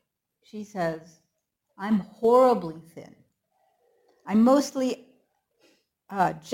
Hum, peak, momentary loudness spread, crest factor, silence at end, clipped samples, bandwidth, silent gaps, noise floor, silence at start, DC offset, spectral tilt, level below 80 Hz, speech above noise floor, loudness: none; -8 dBFS; 23 LU; 18 dB; 0 s; under 0.1%; 17 kHz; none; -78 dBFS; 0.55 s; under 0.1%; -6 dB/octave; -68 dBFS; 54 dB; -24 LUFS